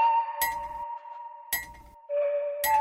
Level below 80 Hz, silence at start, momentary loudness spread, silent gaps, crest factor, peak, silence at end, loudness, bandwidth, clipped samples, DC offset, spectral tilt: -58 dBFS; 0 s; 17 LU; none; 16 dB; -14 dBFS; 0 s; -30 LUFS; 17 kHz; under 0.1%; under 0.1%; -0.5 dB/octave